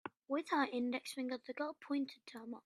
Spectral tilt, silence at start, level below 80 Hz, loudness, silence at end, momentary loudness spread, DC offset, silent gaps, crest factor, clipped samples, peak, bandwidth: -3.5 dB/octave; 0.05 s; -90 dBFS; -40 LUFS; 0.05 s; 9 LU; under 0.1%; none; 20 dB; under 0.1%; -20 dBFS; 13.5 kHz